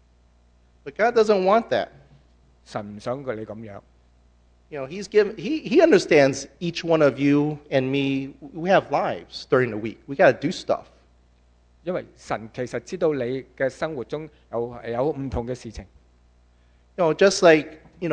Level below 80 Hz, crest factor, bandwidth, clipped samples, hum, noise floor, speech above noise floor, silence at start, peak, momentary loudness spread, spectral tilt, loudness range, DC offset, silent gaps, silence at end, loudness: -52 dBFS; 22 dB; 9.8 kHz; under 0.1%; 60 Hz at -55 dBFS; -58 dBFS; 35 dB; 0.85 s; -2 dBFS; 18 LU; -5.5 dB/octave; 9 LU; under 0.1%; none; 0 s; -22 LUFS